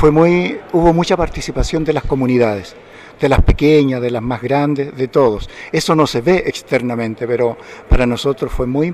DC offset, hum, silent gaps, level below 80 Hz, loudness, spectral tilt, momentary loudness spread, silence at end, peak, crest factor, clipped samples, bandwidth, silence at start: under 0.1%; none; none; -24 dBFS; -16 LUFS; -6.5 dB/octave; 8 LU; 0 s; -2 dBFS; 12 dB; under 0.1%; 14.5 kHz; 0 s